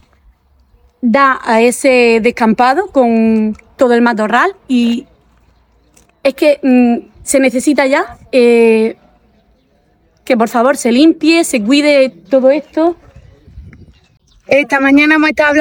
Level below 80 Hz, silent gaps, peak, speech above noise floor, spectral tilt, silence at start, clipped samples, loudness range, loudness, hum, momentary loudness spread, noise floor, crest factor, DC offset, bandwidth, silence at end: -48 dBFS; none; 0 dBFS; 44 dB; -4 dB/octave; 1.05 s; under 0.1%; 3 LU; -11 LUFS; none; 7 LU; -54 dBFS; 12 dB; under 0.1%; 17.5 kHz; 0 s